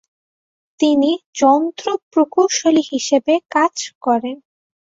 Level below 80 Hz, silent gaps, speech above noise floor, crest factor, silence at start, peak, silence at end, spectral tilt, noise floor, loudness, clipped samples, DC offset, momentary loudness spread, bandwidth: -66 dBFS; 1.26-1.33 s, 2.02-2.11 s, 3.95-4.01 s; over 74 dB; 16 dB; 0.8 s; -2 dBFS; 0.6 s; -2.5 dB/octave; under -90 dBFS; -17 LUFS; under 0.1%; under 0.1%; 7 LU; 7.8 kHz